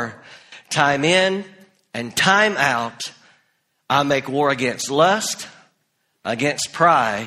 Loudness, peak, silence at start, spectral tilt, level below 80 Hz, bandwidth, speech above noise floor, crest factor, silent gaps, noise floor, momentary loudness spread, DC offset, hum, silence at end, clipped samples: -18 LUFS; 0 dBFS; 0 s; -3.5 dB/octave; -60 dBFS; 15.5 kHz; 51 dB; 20 dB; none; -69 dBFS; 15 LU; under 0.1%; none; 0 s; under 0.1%